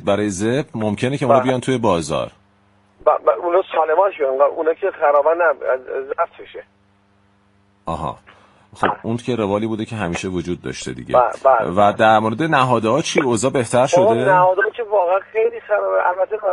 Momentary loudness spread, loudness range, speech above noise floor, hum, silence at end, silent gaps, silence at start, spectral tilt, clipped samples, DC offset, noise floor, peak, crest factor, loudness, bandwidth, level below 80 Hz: 11 LU; 9 LU; 40 dB; none; 0 s; none; 0 s; -5.5 dB/octave; under 0.1%; under 0.1%; -57 dBFS; 0 dBFS; 18 dB; -18 LUFS; 11.5 kHz; -52 dBFS